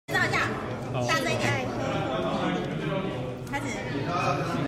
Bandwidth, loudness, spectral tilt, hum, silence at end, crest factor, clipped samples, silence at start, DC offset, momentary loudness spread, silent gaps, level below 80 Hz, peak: 15 kHz; -28 LUFS; -5 dB/octave; none; 0 s; 16 dB; under 0.1%; 0.1 s; under 0.1%; 7 LU; none; -52 dBFS; -12 dBFS